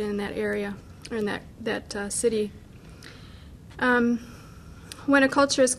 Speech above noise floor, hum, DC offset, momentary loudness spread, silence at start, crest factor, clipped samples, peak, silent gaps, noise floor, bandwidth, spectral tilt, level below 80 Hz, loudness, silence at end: 21 dB; none; under 0.1%; 25 LU; 0 s; 20 dB; under 0.1%; -6 dBFS; none; -45 dBFS; 14 kHz; -3.5 dB/octave; -52 dBFS; -26 LUFS; 0 s